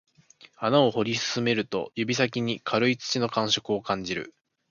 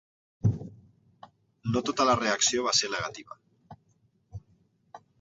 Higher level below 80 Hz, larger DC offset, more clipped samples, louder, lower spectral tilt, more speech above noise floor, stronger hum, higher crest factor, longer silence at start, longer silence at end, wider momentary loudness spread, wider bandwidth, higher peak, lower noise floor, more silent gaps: second, -64 dBFS vs -56 dBFS; neither; neither; about the same, -26 LUFS vs -27 LUFS; about the same, -4.5 dB/octave vs -3.5 dB/octave; second, 30 dB vs 41 dB; neither; about the same, 20 dB vs 22 dB; first, 0.6 s vs 0.45 s; first, 0.4 s vs 0.25 s; second, 9 LU vs 24 LU; about the same, 7.4 kHz vs 8 kHz; first, -6 dBFS vs -10 dBFS; second, -56 dBFS vs -68 dBFS; neither